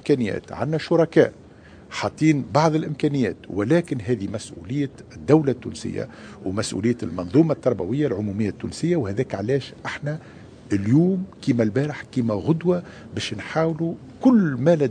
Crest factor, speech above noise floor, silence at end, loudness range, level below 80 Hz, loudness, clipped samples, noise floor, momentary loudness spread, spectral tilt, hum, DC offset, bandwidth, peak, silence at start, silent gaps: 20 dB; 24 dB; 0 s; 3 LU; -56 dBFS; -23 LUFS; under 0.1%; -46 dBFS; 11 LU; -7 dB/octave; none; under 0.1%; 10 kHz; -2 dBFS; 0.05 s; none